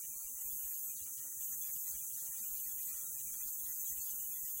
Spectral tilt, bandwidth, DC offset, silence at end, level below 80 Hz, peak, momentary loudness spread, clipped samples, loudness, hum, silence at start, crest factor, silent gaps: 1 dB/octave; 16 kHz; under 0.1%; 0 s; -72 dBFS; -26 dBFS; 2 LU; under 0.1%; -39 LUFS; none; 0 s; 16 dB; none